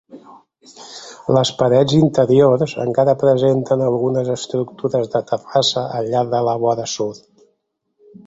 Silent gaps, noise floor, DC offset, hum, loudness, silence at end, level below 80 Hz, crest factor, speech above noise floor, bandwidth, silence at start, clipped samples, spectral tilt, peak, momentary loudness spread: none; -70 dBFS; under 0.1%; none; -17 LUFS; 1.1 s; -56 dBFS; 16 dB; 53 dB; 8.2 kHz; 0.15 s; under 0.1%; -6 dB/octave; -2 dBFS; 10 LU